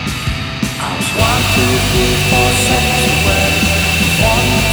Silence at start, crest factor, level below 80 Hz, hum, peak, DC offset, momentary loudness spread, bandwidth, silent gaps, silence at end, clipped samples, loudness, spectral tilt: 0 s; 12 dB; -24 dBFS; none; 0 dBFS; under 0.1%; 8 LU; over 20 kHz; none; 0 s; under 0.1%; -12 LUFS; -3.5 dB/octave